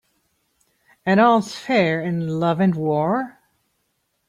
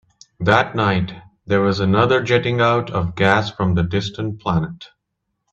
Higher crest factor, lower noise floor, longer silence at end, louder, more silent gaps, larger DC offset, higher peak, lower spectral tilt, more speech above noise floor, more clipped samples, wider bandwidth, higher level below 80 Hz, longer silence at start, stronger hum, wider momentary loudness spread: about the same, 18 dB vs 18 dB; second, -71 dBFS vs -76 dBFS; first, 1 s vs 0.65 s; about the same, -20 LUFS vs -18 LUFS; neither; neither; second, -4 dBFS vs 0 dBFS; about the same, -7 dB/octave vs -6.5 dB/octave; second, 52 dB vs 58 dB; neither; first, 11 kHz vs 8 kHz; second, -64 dBFS vs -46 dBFS; first, 1.05 s vs 0.4 s; neither; about the same, 9 LU vs 9 LU